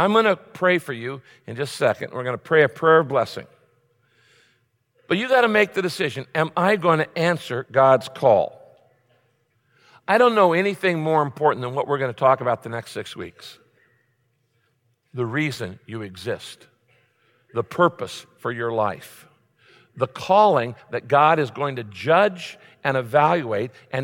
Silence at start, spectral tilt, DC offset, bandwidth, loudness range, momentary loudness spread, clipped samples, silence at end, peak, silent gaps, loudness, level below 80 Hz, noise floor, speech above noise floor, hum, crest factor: 0 s; -6 dB/octave; under 0.1%; 17 kHz; 10 LU; 16 LU; under 0.1%; 0 s; -4 dBFS; none; -21 LUFS; -70 dBFS; -68 dBFS; 47 dB; none; 18 dB